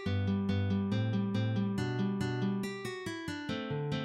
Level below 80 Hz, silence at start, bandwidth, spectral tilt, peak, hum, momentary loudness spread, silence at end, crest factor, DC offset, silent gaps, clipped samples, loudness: -66 dBFS; 0 s; 13 kHz; -7 dB/octave; -20 dBFS; none; 7 LU; 0 s; 12 dB; under 0.1%; none; under 0.1%; -34 LUFS